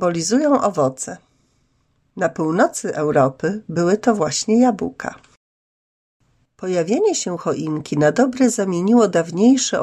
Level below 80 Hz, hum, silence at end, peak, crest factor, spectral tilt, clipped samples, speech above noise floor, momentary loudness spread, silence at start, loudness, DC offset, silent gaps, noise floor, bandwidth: -60 dBFS; none; 0 s; -4 dBFS; 16 dB; -5 dB/octave; under 0.1%; 46 dB; 10 LU; 0 s; -18 LUFS; under 0.1%; 5.37-6.20 s; -64 dBFS; 12.5 kHz